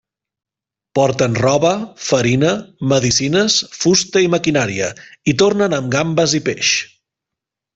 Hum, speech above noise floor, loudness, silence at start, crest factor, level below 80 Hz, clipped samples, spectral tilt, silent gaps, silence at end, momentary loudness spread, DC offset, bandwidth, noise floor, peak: none; 71 dB; -16 LUFS; 0.95 s; 16 dB; -50 dBFS; under 0.1%; -4 dB/octave; none; 0.9 s; 7 LU; under 0.1%; 8.2 kHz; -87 dBFS; -2 dBFS